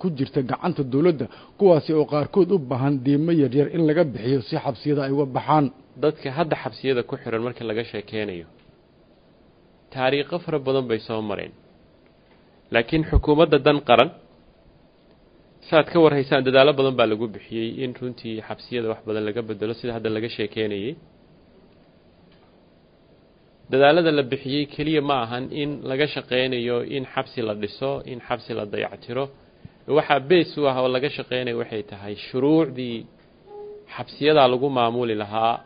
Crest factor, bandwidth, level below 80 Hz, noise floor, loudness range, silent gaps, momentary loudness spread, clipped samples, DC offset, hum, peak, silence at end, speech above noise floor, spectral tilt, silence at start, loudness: 22 dB; 5.2 kHz; -44 dBFS; -55 dBFS; 8 LU; none; 13 LU; under 0.1%; under 0.1%; none; 0 dBFS; 0.05 s; 33 dB; -10 dB/octave; 0 s; -22 LUFS